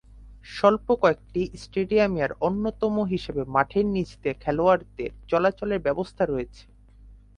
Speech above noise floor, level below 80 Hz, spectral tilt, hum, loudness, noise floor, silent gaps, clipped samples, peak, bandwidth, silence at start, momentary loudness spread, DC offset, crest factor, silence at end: 25 dB; -46 dBFS; -7 dB/octave; none; -25 LUFS; -50 dBFS; none; under 0.1%; -4 dBFS; 10.5 kHz; 0.15 s; 8 LU; under 0.1%; 20 dB; 0.2 s